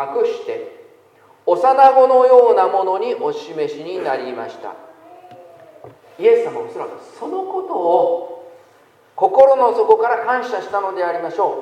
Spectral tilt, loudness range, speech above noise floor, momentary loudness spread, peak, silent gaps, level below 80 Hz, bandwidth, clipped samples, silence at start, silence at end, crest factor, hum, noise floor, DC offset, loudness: -5 dB/octave; 9 LU; 35 dB; 19 LU; 0 dBFS; none; -72 dBFS; 9 kHz; under 0.1%; 0 s; 0 s; 16 dB; none; -51 dBFS; under 0.1%; -16 LUFS